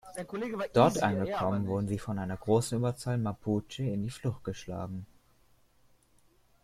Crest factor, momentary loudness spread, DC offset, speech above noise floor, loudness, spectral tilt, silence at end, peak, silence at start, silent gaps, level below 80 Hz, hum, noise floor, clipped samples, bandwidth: 22 dB; 14 LU; under 0.1%; 34 dB; -32 LUFS; -6.5 dB/octave; 1.6 s; -10 dBFS; 0.05 s; none; -60 dBFS; none; -65 dBFS; under 0.1%; 14.5 kHz